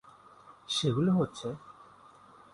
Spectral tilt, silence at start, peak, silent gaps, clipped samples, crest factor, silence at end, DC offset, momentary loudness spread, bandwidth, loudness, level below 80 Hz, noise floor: -6 dB/octave; 0.05 s; -18 dBFS; none; under 0.1%; 16 dB; 0.7 s; under 0.1%; 23 LU; 11.5 kHz; -30 LUFS; -66 dBFS; -56 dBFS